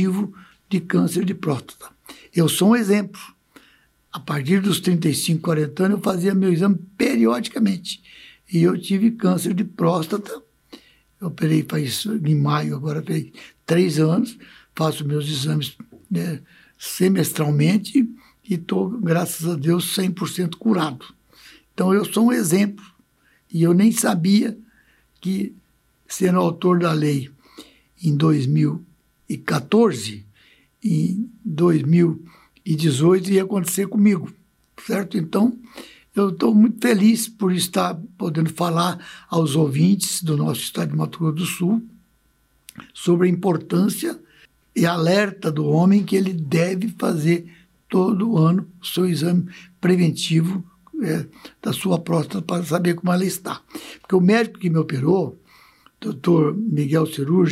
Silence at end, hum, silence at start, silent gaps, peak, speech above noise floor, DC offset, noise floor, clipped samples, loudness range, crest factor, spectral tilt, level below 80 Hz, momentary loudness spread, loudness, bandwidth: 0 s; none; 0 s; none; -6 dBFS; 42 dB; under 0.1%; -62 dBFS; under 0.1%; 3 LU; 14 dB; -6 dB/octave; -64 dBFS; 13 LU; -20 LUFS; 16 kHz